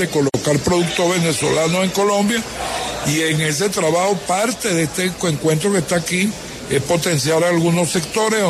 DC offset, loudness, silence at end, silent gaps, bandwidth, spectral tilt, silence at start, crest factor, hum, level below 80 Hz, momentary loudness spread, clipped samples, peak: under 0.1%; -17 LUFS; 0 s; none; 13.5 kHz; -4 dB/octave; 0 s; 14 dB; none; -46 dBFS; 5 LU; under 0.1%; -4 dBFS